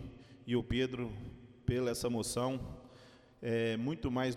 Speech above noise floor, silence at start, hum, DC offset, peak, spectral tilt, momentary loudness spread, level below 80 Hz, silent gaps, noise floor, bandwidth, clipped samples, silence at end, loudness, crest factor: 24 dB; 0 s; none; under 0.1%; -20 dBFS; -5.5 dB/octave; 17 LU; -54 dBFS; none; -59 dBFS; 16 kHz; under 0.1%; 0 s; -36 LUFS; 16 dB